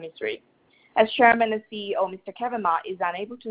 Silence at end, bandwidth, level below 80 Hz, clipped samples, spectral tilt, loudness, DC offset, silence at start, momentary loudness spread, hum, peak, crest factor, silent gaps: 0 s; 4 kHz; -66 dBFS; under 0.1%; -7.5 dB/octave; -24 LUFS; under 0.1%; 0 s; 14 LU; none; -2 dBFS; 22 dB; none